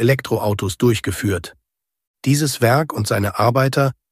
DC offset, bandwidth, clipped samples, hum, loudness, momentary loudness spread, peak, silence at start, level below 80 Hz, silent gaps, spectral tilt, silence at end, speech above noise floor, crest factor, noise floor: under 0.1%; 15.5 kHz; under 0.1%; none; -19 LUFS; 6 LU; -2 dBFS; 0 s; -48 dBFS; 2.07-2.14 s; -5.5 dB/octave; 0.2 s; 56 dB; 16 dB; -74 dBFS